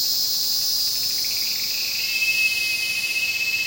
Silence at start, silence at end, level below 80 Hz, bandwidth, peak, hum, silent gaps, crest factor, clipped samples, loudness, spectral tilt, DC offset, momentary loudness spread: 0 s; 0 s; -60 dBFS; 16.5 kHz; -8 dBFS; none; none; 14 dB; under 0.1%; -20 LUFS; 2 dB/octave; under 0.1%; 3 LU